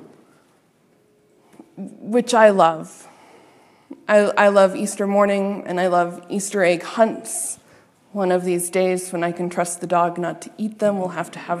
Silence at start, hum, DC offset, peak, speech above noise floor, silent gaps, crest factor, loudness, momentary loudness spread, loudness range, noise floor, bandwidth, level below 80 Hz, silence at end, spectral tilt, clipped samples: 0 s; none; under 0.1%; 0 dBFS; 40 dB; none; 20 dB; -19 LUFS; 15 LU; 4 LU; -59 dBFS; 14 kHz; -76 dBFS; 0 s; -4.5 dB/octave; under 0.1%